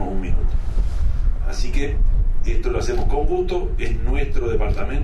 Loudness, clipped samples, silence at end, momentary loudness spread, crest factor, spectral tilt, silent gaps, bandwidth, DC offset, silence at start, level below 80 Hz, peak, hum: -24 LUFS; under 0.1%; 0 s; 4 LU; 10 dB; -7 dB/octave; none; 7.2 kHz; under 0.1%; 0 s; -18 dBFS; -6 dBFS; none